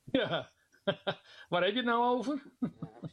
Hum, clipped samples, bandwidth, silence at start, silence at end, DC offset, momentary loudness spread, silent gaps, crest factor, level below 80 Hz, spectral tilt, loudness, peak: none; under 0.1%; 10.5 kHz; 0.05 s; 0.05 s; under 0.1%; 12 LU; none; 18 dB; -70 dBFS; -6 dB/octave; -33 LUFS; -16 dBFS